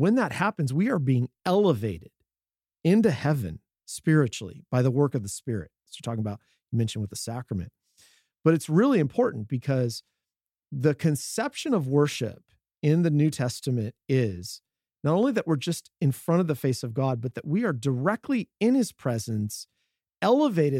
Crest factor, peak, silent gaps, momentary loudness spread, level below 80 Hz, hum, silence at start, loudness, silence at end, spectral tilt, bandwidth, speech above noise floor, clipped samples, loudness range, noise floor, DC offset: 20 dB; -6 dBFS; 10.36-10.40 s; 12 LU; -64 dBFS; none; 0 s; -26 LUFS; 0 s; -6.5 dB/octave; 15.5 kHz; over 65 dB; under 0.1%; 2 LU; under -90 dBFS; under 0.1%